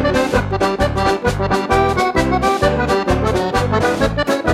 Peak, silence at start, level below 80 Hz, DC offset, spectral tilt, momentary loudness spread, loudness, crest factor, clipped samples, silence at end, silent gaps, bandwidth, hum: -2 dBFS; 0 s; -28 dBFS; under 0.1%; -5.5 dB/octave; 2 LU; -16 LUFS; 14 dB; under 0.1%; 0 s; none; 15.5 kHz; none